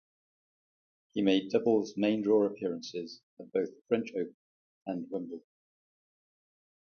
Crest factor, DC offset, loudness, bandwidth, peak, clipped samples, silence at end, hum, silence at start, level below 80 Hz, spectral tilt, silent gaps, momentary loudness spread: 20 dB; under 0.1%; -32 LUFS; 6.8 kHz; -14 dBFS; under 0.1%; 1.45 s; none; 1.15 s; -76 dBFS; -6 dB/octave; 3.23-3.37 s, 3.81-3.85 s, 4.34-4.81 s; 16 LU